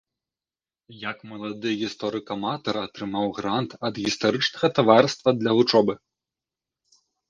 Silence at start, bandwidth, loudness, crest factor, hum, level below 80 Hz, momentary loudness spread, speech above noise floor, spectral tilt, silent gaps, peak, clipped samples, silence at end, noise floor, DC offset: 0.9 s; 9.6 kHz; -23 LUFS; 24 dB; none; -64 dBFS; 16 LU; over 67 dB; -5 dB/octave; none; 0 dBFS; under 0.1%; 1.35 s; under -90 dBFS; under 0.1%